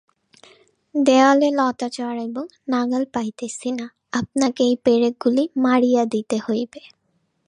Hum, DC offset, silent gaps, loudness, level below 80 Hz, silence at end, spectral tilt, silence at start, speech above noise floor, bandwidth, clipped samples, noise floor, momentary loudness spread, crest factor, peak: none; under 0.1%; none; -20 LUFS; -64 dBFS; 0.7 s; -4.5 dB/octave; 0.95 s; 49 dB; 10.5 kHz; under 0.1%; -68 dBFS; 13 LU; 18 dB; -2 dBFS